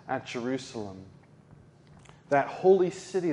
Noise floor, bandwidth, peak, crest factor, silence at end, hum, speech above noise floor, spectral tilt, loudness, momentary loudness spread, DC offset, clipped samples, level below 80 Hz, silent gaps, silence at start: -55 dBFS; 10.5 kHz; -10 dBFS; 20 dB; 0 s; none; 27 dB; -6 dB/octave; -28 LUFS; 17 LU; under 0.1%; under 0.1%; -68 dBFS; none; 0.05 s